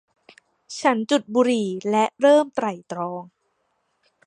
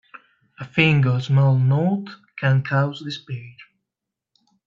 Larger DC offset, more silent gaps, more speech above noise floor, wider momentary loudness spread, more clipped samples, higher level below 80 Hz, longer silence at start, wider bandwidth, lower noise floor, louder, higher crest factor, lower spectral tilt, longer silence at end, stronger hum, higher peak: neither; neither; second, 50 dB vs 65 dB; second, 13 LU vs 18 LU; neither; second, -74 dBFS vs -60 dBFS; about the same, 0.7 s vs 0.6 s; first, 10.5 kHz vs 7.2 kHz; second, -71 dBFS vs -85 dBFS; about the same, -21 LUFS vs -20 LUFS; about the same, 18 dB vs 20 dB; second, -4.5 dB/octave vs -8 dB/octave; about the same, 1.05 s vs 1.05 s; neither; about the same, -4 dBFS vs -2 dBFS